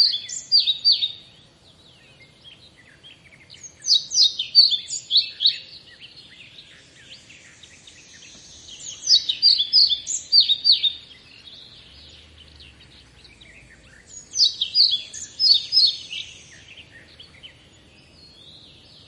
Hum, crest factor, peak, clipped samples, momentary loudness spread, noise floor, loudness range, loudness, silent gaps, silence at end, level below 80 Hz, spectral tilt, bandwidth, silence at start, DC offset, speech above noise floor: none; 20 dB; -4 dBFS; under 0.1%; 18 LU; -52 dBFS; 9 LU; -17 LUFS; none; 1.6 s; -62 dBFS; 2 dB/octave; 11.5 kHz; 0 s; under 0.1%; 32 dB